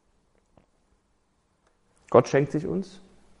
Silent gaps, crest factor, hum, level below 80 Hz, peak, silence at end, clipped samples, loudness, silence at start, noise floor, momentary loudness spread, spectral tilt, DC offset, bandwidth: none; 26 dB; none; -62 dBFS; -4 dBFS; 0.55 s; under 0.1%; -24 LUFS; 2.1 s; -69 dBFS; 12 LU; -7 dB/octave; under 0.1%; 10.5 kHz